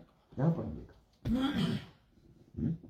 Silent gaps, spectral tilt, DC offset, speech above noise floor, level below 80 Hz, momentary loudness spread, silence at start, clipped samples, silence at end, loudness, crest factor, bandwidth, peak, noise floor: none; -7.5 dB/octave; under 0.1%; 29 dB; -54 dBFS; 16 LU; 0 s; under 0.1%; 0 s; -35 LUFS; 18 dB; 14 kHz; -18 dBFS; -62 dBFS